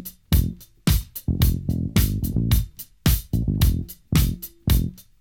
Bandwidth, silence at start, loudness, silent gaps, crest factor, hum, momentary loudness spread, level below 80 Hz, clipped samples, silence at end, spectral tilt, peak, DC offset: 18 kHz; 0 s; -23 LUFS; none; 16 dB; none; 7 LU; -26 dBFS; under 0.1%; 0.2 s; -5.5 dB/octave; -6 dBFS; 0.1%